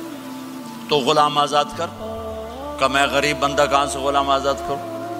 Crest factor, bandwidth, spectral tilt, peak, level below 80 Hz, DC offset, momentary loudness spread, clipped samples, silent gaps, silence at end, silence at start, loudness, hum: 20 dB; 16 kHz; -3.5 dB/octave; -2 dBFS; -44 dBFS; under 0.1%; 16 LU; under 0.1%; none; 0 s; 0 s; -19 LUFS; none